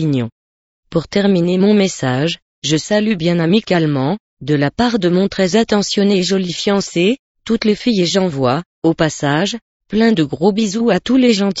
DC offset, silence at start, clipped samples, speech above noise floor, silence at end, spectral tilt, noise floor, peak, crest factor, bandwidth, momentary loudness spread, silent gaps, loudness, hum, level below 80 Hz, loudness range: under 0.1%; 0 s; under 0.1%; over 76 dB; 0 s; -5.5 dB/octave; under -90 dBFS; 0 dBFS; 14 dB; 8 kHz; 7 LU; 0.32-0.83 s, 2.42-2.62 s, 4.20-4.37 s, 7.19-7.35 s, 8.66-8.82 s, 9.62-9.80 s; -15 LUFS; none; -48 dBFS; 1 LU